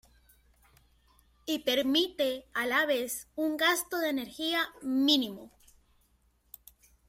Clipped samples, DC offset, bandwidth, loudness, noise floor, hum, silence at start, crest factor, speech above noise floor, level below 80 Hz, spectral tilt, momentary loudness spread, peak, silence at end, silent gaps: under 0.1%; under 0.1%; 16.5 kHz; -29 LUFS; -69 dBFS; none; 1.45 s; 20 dB; 39 dB; -66 dBFS; -1.5 dB/octave; 9 LU; -12 dBFS; 1.6 s; none